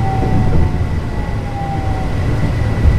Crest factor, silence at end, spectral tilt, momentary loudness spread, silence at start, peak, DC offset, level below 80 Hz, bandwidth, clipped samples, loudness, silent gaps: 14 dB; 0 s; -8 dB/octave; 6 LU; 0 s; 0 dBFS; under 0.1%; -20 dBFS; 10.5 kHz; under 0.1%; -18 LUFS; none